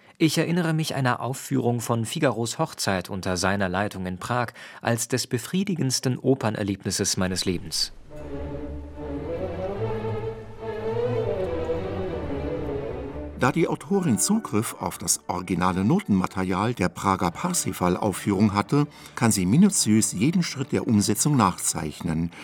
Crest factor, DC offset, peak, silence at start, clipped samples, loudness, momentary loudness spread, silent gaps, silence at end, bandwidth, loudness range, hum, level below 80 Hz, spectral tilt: 20 dB; under 0.1%; -4 dBFS; 0.2 s; under 0.1%; -25 LUFS; 10 LU; none; 0 s; 19 kHz; 7 LU; none; -48 dBFS; -4.5 dB/octave